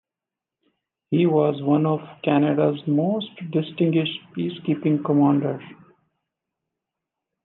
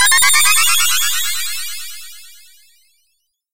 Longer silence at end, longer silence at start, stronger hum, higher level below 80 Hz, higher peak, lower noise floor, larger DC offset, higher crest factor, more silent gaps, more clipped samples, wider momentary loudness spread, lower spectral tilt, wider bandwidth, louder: first, 1.7 s vs 0 s; first, 1.1 s vs 0 s; neither; second, -74 dBFS vs -54 dBFS; second, -6 dBFS vs 0 dBFS; first, -88 dBFS vs -67 dBFS; neither; about the same, 16 dB vs 16 dB; neither; neither; second, 9 LU vs 21 LU; first, -11 dB/octave vs 4 dB/octave; second, 4.1 kHz vs 16 kHz; second, -22 LUFS vs -12 LUFS